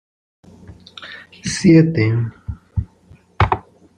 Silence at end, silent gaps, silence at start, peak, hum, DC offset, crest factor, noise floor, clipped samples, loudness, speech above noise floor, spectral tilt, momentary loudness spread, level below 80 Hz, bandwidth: 0.4 s; none; 1 s; -2 dBFS; none; under 0.1%; 18 dB; -49 dBFS; under 0.1%; -17 LUFS; 35 dB; -6.5 dB/octave; 24 LU; -38 dBFS; 10.5 kHz